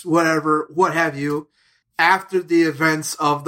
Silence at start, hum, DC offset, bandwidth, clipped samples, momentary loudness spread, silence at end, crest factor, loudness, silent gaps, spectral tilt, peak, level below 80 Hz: 0 s; none; under 0.1%; 16.5 kHz; under 0.1%; 8 LU; 0 s; 18 dB; -19 LUFS; none; -4.5 dB/octave; -2 dBFS; -66 dBFS